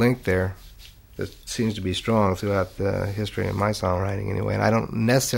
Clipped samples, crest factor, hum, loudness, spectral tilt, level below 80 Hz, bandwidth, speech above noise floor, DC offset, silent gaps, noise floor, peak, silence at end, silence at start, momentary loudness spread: under 0.1%; 18 dB; none; -24 LUFS; -5.5 dB/octave; -46 dBFS; 16 kHz; 23 dB; under 0.1%; none; -46 dBFS; -4 dBFS; 0 s; 0 s; 10 LU